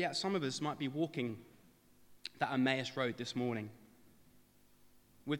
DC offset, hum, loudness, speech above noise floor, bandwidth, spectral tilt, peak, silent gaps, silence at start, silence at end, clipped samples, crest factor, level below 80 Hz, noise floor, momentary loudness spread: under 0.1%; 50 Hz at -75 dBFS; -37 LUFS; 28 dB; 17 kHz; -5 dB/octave; -18 dBFS; none; 0 s; 0 s; under 0.1%; 22 dB; -78 dBFS; -66 dBFS; 16 LU